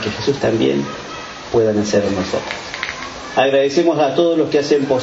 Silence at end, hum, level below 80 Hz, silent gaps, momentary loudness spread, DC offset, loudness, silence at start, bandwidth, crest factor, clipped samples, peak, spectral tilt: 0 s; none; -48 dBFS; none; 11 LU; under 0.1%; -17 LUFS; 0 s; 8 kHz; 16 dB; under 0.1%; 0 dBFS; -5 dB/octave